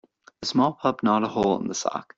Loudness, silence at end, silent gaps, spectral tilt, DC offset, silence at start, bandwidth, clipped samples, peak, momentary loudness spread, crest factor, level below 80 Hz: -24 LUFS; 0.15 s; none; -5 dB/octave; under 0.1%; 0.4 s; 8 kHz; under 0.1%; -8 dBFS; 6 LU; 18 dB; -60 dBFS